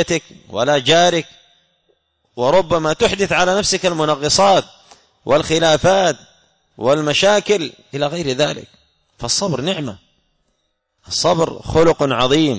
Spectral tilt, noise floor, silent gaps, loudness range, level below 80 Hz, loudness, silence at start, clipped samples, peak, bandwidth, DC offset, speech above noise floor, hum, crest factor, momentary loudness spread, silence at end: -3.5 dB/octave; -69 dBFS; none; 6 LU; -44 dBFS; -16 LUFS; 0 s; under 0.1%; -2 dBFS; 8 kHz; under 0.1%; 53 dB; none; 14 dB; 12 LU; 0 s